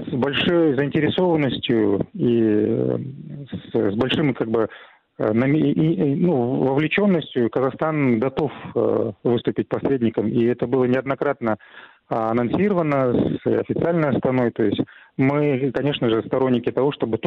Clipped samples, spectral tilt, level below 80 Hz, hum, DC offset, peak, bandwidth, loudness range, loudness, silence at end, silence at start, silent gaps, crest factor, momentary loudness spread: under 0.1%; -9.5 dB/octave; -54 dBFS; none; under 0.1%; -8 dBFS; 5.4 kHz; 2 LU; -21 LUFS; 0 s; 0 s; none; 12 dB; 6 LU